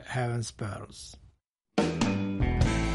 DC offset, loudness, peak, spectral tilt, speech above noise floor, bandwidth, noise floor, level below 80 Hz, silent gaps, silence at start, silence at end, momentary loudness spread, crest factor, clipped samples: under 0.1%; -30 LUFS; -14 dBFS; -6 dB/octave; 32 dB; 11.5 kHz; -66 dBFS; -38 dBFS; 1.51-1.55 s; 0 s; 0 s; 16 LU; 16 dB; under 0.1%